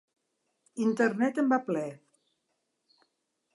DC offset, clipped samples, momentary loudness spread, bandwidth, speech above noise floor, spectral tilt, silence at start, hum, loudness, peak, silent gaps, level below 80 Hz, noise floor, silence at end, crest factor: under 0.1%; under 0.1%; 11 LU; 11.5 kHz; 52 dB; -6.5 dB/octave; 0.75 s; none; -28 LUFS; -12 dBFS; none; -86 dBFS; -80 dBFS; 1.6 s; 20 dB